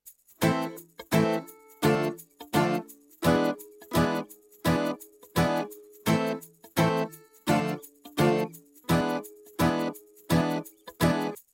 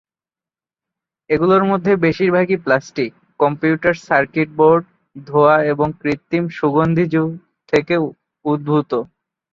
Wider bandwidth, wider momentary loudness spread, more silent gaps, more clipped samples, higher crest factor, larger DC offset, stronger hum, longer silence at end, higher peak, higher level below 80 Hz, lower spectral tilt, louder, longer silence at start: first, 17 kHz vs 7.4 kHz; first, 14 LU vs 10 LU; neither; neither; about the same, 20 dB vs 16 dB; neither; neither; second, 0.15 s vs 0.5 s; second, -8 dBFS vs -2 dBFS; about the same, -54 dBFS vs -52 dBFS; second, -6 dB/octave vs -8 dB/octave; second, -28 LUFS vs -17 LUFS; second, 0.05 s vs 1.3 s